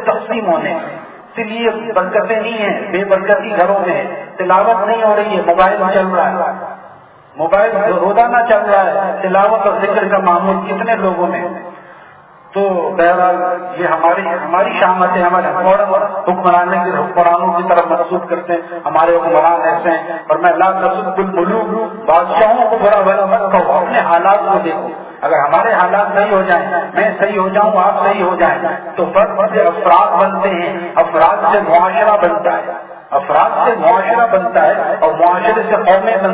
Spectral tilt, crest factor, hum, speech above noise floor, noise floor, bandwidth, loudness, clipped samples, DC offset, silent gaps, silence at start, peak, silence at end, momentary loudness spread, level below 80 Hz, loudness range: -9.5 dB/octave; 12 dB; none; 28 dB; -40 dBFS; 4 kHz; -13 LUFS; under 0.1%; under 0.1%; none; 0 s; 0 dBFS; 0 s; 8 LU; -54 dBFS; 3 LU